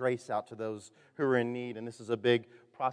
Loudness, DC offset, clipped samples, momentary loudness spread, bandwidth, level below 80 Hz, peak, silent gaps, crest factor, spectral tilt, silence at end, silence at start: -33 LUFS; under 0.1%; under 0.1%; 13 LU; 10.5 kHz; -86 dBFS; -14 dBFS; none; 20 dB; -6 dB/octave; 0 s; 0 s